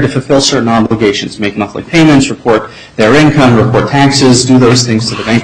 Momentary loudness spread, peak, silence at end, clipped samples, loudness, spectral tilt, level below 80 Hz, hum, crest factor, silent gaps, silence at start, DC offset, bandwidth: 8 LU; 0 dBFS; 0 s; 0.1%; -8 LUFS; -5 dB/octave; -36 dBFS; none; 8 dB; none; 0 s; under 0.1%; 11 kHz